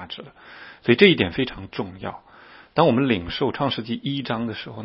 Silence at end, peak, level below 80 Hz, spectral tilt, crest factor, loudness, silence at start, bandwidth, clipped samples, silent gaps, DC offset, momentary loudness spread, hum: 0 s; 0 dBFS; -52 dBFS; -8.5 dB/octave; 22 dB; -22 LUFS; 0 s; 5.8 kHz; under 0.1%; none; under 0.1%; 20 LU; none